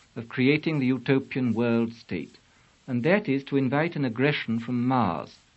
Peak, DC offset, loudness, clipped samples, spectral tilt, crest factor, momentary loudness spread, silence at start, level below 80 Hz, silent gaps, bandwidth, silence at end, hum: -6 dBFS; under 0.1%; -26 LUFS; under 0.1%; -8 dB/octave; 20 dB; 12 LU; 0.15 s; -66 dBFS; none; 7.8 kHz; 0.25 s; none